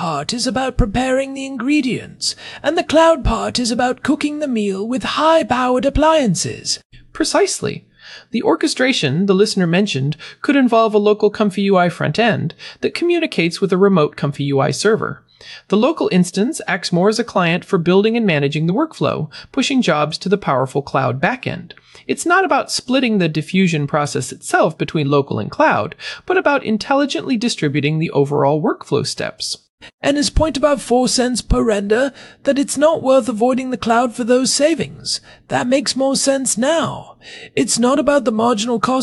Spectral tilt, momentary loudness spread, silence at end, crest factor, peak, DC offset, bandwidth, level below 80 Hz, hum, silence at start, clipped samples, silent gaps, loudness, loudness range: -4.5 dB/octave; 9 LU; 0 s; 14 dB; -2 dBFS; under 0.1%; 13.5 kHz; -36 dBFS; none; 0 s; under 0.1%; 6.85-6.90 s, 29.69-29.78 s, 29.94-29.98 s; -17 LUFS; 2 LU